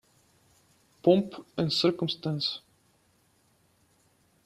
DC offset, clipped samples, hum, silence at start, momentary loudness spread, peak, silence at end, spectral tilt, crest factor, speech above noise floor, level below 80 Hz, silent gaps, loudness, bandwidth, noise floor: under 0.1%; under 0.1%; none; 1.05 s; 9 LU; -8 dBFS; 1.9 s; -6.5 dB/octave; 22 dB; 40 dB; -70 dBFS; none; -28 LUFS; 13.5 kHz; -67 dBFS